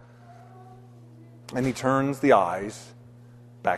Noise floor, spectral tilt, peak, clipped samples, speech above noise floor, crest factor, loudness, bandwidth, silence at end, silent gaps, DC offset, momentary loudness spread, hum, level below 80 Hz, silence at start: -49 dBFS; -6 dB/octave; -4 dBFS; under 0.1%; 25 dB; 22 dB; -24 LUFS; 13.5 kHz; 0 s; none; under 0.1%; 24 LU; none; -60 dBFS; 0.3 s